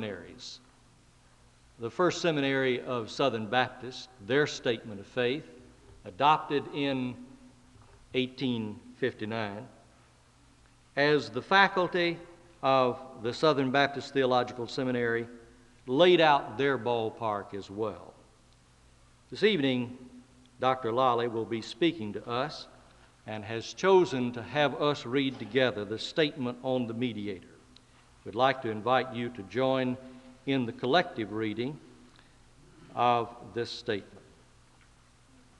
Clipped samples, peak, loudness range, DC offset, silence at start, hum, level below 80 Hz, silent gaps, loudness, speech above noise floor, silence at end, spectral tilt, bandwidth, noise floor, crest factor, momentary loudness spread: under 0.1%; -6 dBFS; 6 LU; under 0.1%; 0 s; none; -64 dBFS; none; -29 LUFS; 31 dB; 1.4 s; -5.5 dB/octave; 11 kHz; -60 dBFS; 24 dB; 16 LU